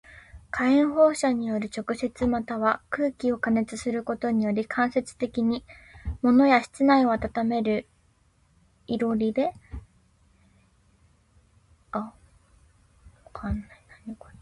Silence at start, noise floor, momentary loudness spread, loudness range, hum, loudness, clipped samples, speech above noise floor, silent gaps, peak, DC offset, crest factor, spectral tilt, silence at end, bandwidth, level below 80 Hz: 0.15 s; -64 dBFS; 18 LU; 16 LU; none; -25 LUFS; under 0.1%; 39 dB; none; -6 dBFS; under 0.1%; 20 dB; -6 dB/octave; 0.3 s; 11.5 kHz; -48 dBFS